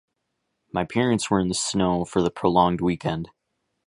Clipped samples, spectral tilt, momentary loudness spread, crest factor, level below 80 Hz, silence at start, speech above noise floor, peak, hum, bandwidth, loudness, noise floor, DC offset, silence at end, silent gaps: under 0.1%; -5 dB/octave; 10 LU; 20 dB; -48 dBFS; 0.75 s; 55 dB; -4 dBFS; none; 11.5 kHz; -23 LUFS; -77 dBFS; under 0.1%; 0.6 s; none